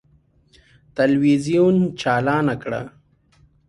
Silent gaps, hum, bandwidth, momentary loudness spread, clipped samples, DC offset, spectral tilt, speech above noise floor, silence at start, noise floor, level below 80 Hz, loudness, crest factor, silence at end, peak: none; none; 11.5 kHz; 13 LU; under 0.1%; under 0.1%; -7 dB/octave; 40 dB; 0.95 s; -58 dBFS; -54 dBFS; -19 LUFS; 16 dB; 0.8 s; -6 dBFS